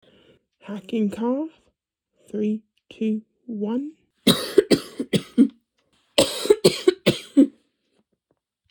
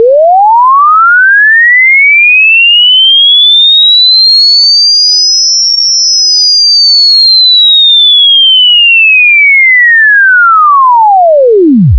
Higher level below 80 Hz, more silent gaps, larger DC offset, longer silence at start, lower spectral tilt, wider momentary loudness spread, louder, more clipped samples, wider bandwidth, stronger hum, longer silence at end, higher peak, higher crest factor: second, -60 dBFS vs -30 dBFS; neither; second, under 0.1% vs 0.8%; first, 0.65 s vs 0 s; first, -4.5 dB/octave vs -1.5 dB/octave; first, 14 LU vs 4 LU; second, -22 LUFS vs -1 LUFS; second, under 0.1% vs 0.3%; first, over 20 kHz vs 5.4 kHz; neither; first, 1.2 s vs 0 s; about the same, -2 dBFS vs 0 dBFS; first, 22 dB vs 4 dB